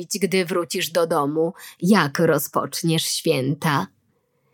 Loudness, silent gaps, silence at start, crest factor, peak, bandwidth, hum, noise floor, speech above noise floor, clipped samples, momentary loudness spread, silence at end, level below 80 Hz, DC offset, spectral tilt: -21 LUFS; none; 0 s; 20 dB; -2 dBFS; 19.5 kHz; none; -66 dBFS; 45 dB; under 0.1%; 6 LU; 0.7 s; -70 dBFS; under 0.1%; -4.5 dB/octave